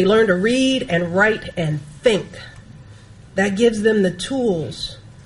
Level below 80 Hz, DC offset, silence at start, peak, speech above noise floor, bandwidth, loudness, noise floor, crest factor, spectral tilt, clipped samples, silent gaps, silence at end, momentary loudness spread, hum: -46 dBFS; under 0.1%; 0 s; -2 dBFS; 24 dB; 11.5 kHz; -19 LUFS; -42 dBFS; 16 dB; -5 dB/octave; under 0.1%; none; 0.05 s; 13 LU; none